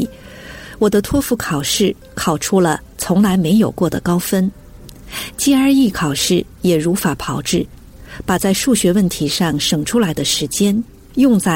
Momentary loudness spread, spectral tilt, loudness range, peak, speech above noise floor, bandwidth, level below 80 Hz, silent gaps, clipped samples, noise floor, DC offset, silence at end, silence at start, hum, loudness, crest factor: 11 LU; -4.5 dB/octave; 1 LU; -4 dBFS; 21 dB; 17 kHz; -40 dBFS; none; under 0.1%; -37 dBFS; under 0.1%; 0 s; 0 s; none; -16 LUFS; 12 dB